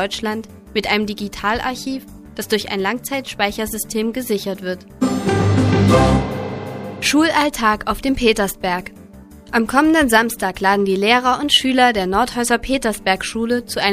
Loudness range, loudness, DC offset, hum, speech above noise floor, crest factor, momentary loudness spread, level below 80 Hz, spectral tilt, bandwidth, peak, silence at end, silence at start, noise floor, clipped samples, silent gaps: 7 LU; -18 LUFS; under 0.1%; none; 22 dB; 18 dB; 11 LU; -36 dBFS; -4.5 dB/octave; 15.5 kHz; 0 dBFS; 0 s; 0 s; -40 dBFS; under 0.1%; none